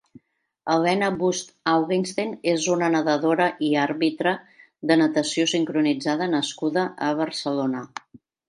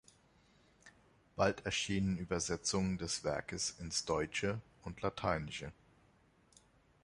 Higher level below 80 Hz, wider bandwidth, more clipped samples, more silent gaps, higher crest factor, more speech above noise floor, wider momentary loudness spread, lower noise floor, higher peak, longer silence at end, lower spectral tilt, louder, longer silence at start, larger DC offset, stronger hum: second, -70 dBFS vs -58 dBFS; about the same, 11 kHz vs 11.5 kHz; neither; neither; about the same, 18 dB vs 22 dB; about the same, 33 dB vs 32 dB; second, 7 LU vs 10 LU; second, -55 dBFS vs -69 dBFS; first, -6 dBFS vs -18 dBFS; second, 0.65 s vs 1.3 s; about the same, -4.5 dB/octave vs -4 dB/octave; first, -23 LUFS vs -37 LUFS; second, 0.65 s vs 0.85 s; neither; neither